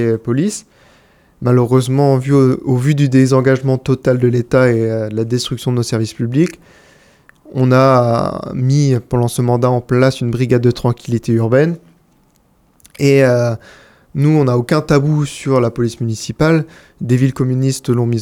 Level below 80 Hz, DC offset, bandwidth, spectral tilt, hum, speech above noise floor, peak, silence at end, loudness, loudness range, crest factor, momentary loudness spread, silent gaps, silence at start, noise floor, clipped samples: -44 dBFS; under 0.1%; 14 kHz; -7 dB/octave; none; 41 dB; 0 dBFS; 0 s; -14 LUFS; 3 LU; 14 dB; 8 LU; none; 0 s; -54 dBFS; under 0.1%